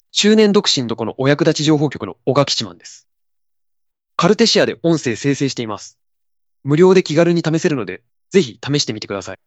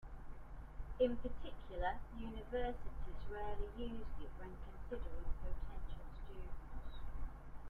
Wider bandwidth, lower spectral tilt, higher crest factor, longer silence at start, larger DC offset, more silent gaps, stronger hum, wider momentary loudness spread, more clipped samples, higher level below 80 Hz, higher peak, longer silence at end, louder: first, 8.6 kHz vs 4.2 kHz; second, -5 dB/octave vs -8 dB/octave; about the same, 16 dB vs 18 dB; first, 0.15 s vs 0 s; neither; neither; neither; about the same, 14 LU vs 13 LU; neither; second, -60 dBFS vs -48 dBFS; first, 0 dBFS vs -24 dBFS; about the same, 0.1 s vs 0 s; first, -16 LUFS vs -47 LUFS